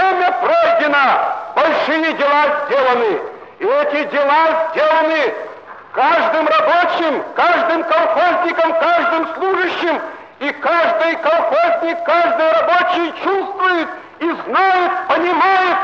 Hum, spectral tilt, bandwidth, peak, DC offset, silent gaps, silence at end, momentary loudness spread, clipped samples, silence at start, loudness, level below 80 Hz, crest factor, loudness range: none; -4 dB/octave; 7.2 kHz; -4 dBFS; 0.1%; none; 0 s; 7 LU; under 0.1%; 0 s; -15 LUFS; -66 dBFS; 12 dB; 2 LU